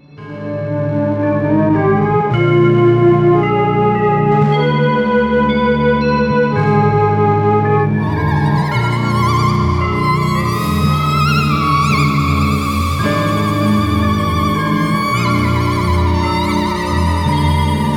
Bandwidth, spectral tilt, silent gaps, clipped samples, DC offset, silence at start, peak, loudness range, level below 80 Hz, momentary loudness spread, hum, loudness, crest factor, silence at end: 18 kHz; -7 dB/octave; none; under 0.1%; under 0.1%; 0.15 s; -2 dBFS; 3 LU; -34 dBFS; 4 LU; none; -14 LUFS; 12 dB; 0 s